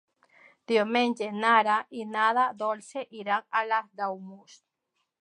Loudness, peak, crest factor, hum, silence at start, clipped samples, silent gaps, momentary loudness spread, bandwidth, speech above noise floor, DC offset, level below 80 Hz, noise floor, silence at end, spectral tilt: -27 LUFS; -8 dBFS; 20 dB; none; 0.7 s; under 0.1%; none; 13 LU; 11 kHz; 52 dB; under 0.1%; -86 dBFS; -80 dBFS; 0.85 s; -4 dB/octave